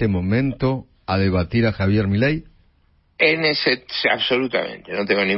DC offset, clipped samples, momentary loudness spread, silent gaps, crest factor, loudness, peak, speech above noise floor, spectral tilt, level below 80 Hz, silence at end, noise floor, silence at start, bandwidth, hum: under 0.1%; under 0.1%; 7 LU; none; 18 dB; -20 LUFS; -2 dBFS; 40 dB; -10.5 dB/octave; -44 dBFS; 0 s; -59 dBFS; 0 s; 5.8 kHz; none